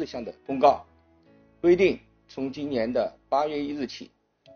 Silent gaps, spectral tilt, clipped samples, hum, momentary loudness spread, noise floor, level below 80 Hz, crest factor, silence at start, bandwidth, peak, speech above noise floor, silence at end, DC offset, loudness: none; -4.5 dB/octave; under 0.1%; none; 15 LU; -58 dBFS; -58 dBFS; 20 dB; 0 s; 6.8 kHz; -6 dBFS; 33 dB; 0.5 s; under 0.1%; -26 LUFS